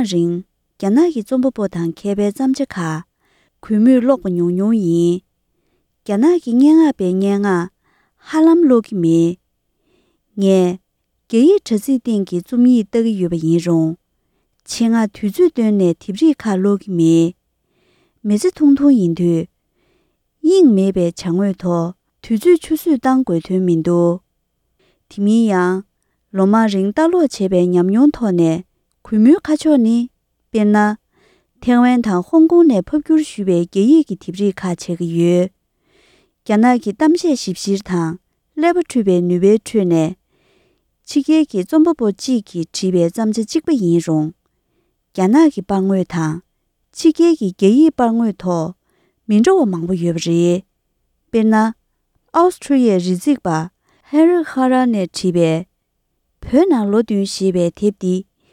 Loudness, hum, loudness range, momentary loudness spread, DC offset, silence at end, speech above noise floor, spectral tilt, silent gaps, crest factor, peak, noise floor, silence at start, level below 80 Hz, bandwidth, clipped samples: -15 LUFS; none; 3 LU; 10 LU; under 0.1%; 0.3 s; 55 dB; -7 dB/octave; none; 14 dB; 0 dBFS; -69 dBFS; 0 s; -52 dBFS; 14 kHz; under 0.1%